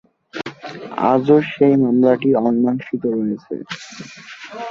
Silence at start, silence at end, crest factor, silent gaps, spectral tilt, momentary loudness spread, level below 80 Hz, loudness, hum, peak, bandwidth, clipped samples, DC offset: 0.35 s; 0 s; 16 dB; none; -7.5 dB/octave; 20 LU; -62 dBFS; -17 LUFS; none; -2 dBFS; 7.4 kHz; under 0.1%; under 0.1%